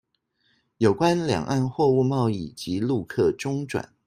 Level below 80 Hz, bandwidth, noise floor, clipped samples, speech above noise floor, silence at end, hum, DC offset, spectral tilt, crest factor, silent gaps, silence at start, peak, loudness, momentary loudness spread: -58 dBFS; 15 kHz; -70 dBFS; under 0.1%; 47 dB; 0.2 s; none; under 0.1%; -6.5 dB/octave; 18 dB; none; 0.8 s; -6 dBFS; -24 LUFS; 8 LU